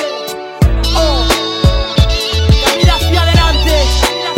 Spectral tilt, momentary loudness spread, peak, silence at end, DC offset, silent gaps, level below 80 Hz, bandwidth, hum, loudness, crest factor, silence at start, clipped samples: -4.5 dB/octave; 4 LU; 0 dBFS; 0 s; under 0.1%; none; -14 dBFS; 16.5 kHz; none; -12 LUFS; 12 dB; 0 s; 0.1%